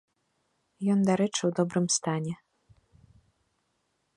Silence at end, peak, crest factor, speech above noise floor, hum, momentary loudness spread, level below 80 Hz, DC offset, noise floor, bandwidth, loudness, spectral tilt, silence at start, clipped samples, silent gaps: 1.8 s; -12 dBFS; 20 dB; 49 dB; none; 9 LU; -70 dBFS; under 0.1%; -76 dBFS; 11.5 kHz; -27 LUFS; -5 dB/octave; 0.8 s; under 0.1%; none